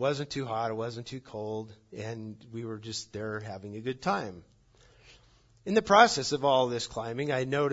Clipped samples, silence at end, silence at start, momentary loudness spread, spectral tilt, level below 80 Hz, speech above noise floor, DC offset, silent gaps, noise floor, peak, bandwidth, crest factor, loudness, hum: under 0.1%; 0 s; 0 s; 18 LU; -4.5 dB/octave; -64 dBFS; 32 dB; under 0.1%; none; -61 dBFS; -6 dBFS; 8 kHz; 26 dB; -29 LUFS; none